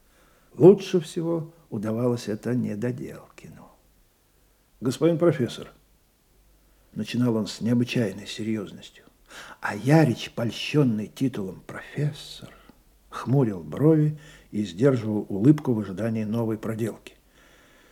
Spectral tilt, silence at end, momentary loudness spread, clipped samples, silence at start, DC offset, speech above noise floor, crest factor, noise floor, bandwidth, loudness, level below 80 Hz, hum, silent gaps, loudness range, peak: -7 dB/octave; 0.95 s; 19 LU; under 0.1%; 0.55 s; under 0.1%; 38 dB; 22 dB; -62 dBFS; 16 kHz; -25 LUFS; -62 dBFS; none; none; 5 LU; -4 dBFS